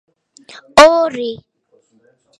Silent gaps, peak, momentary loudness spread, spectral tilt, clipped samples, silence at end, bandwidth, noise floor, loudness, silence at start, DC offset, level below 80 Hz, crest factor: none; 0 dBFS; 18 LU; -2.5 dB/octave; 0.4%; 1.05 s; 13 kHz; -57 dBFS; -11 LUFS; 0.75 s; under 0.1%; -48 dBFS; 16 dB